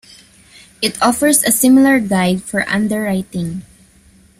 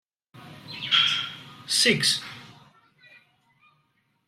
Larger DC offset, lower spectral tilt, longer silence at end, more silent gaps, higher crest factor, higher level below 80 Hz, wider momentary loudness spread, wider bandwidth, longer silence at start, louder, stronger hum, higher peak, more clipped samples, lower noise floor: neither; first, -4 dB/octave vs -1.5 dB/octave; second, 0.8 s vs 1.75 s; neither; second, 16 dB vs 22 dB; first, -50 dBFS vs -70 dBFS; second, 13 LU vs 22 LU; about the same, 16 kHz vs 16 kHz; first, 0.8 s vs 0.35 s; first, -14 LUFS vs -22 LUFS; neither; first, 0 dBFS vs -6 dBFS; neither; second, -48 dBFS vs -70 dBFS